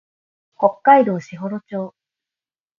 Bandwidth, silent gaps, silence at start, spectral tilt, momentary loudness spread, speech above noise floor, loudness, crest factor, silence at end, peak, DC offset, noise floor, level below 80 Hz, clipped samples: 7.2 kHz; none; 0.6 s; -7.5 dB/octave; 16 LU; over 73 dB; -18 LUFS; 20 dB; 0.9 s; 0 dBFS; under 0.1%; under -90 dBFS; -70 dBFS; under 0.1%